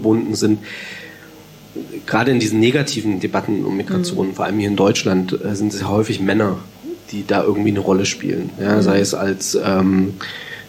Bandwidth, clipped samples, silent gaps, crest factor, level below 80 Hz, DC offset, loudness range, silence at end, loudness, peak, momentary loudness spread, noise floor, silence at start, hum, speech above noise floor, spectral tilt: 16.5 kHz; under 0.1%; none; 14 dB; -54 dBFS; under 0.1%; 2 LU; 0 s; -18 LUFS; -4 dBFS; 14 LU; -41 dBFS; 0 s; none; 23 dB; -5 dB/octave